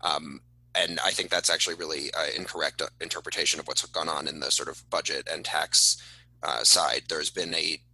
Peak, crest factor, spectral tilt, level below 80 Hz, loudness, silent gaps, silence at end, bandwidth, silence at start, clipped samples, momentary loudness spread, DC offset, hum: -6 dBFS; 22 dB; 0 dB/octave; -62 dBFS; -26 LUFS; none; 0.15 s; 14 kHz; 0.05 s; under 0.1%; 12 LU; under 0.1%; 60 Hz at -55 dBFS